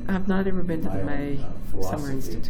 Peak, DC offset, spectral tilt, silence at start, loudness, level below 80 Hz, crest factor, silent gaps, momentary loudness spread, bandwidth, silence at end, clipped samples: -10 dBFS; under 0.1%; -7 dB/octave; 0 s; -28 LUFS; -34 dBFS; 10 dB; none; 8 LU; 16 kHz; 0 s; under 0.1%